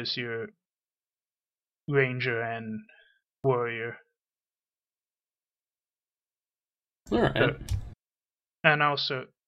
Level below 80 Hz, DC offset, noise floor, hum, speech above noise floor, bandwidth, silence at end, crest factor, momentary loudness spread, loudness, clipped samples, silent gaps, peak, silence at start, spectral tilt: -50 dBFS; under 0.1%; under -90 dBFS; none; over 62 dB; 13 kHz; 0.2 s; 28 dB; 15 LU; -28 LUFS; under 0.1%; none; -4 dBFS; 0 s; -6 dB/octave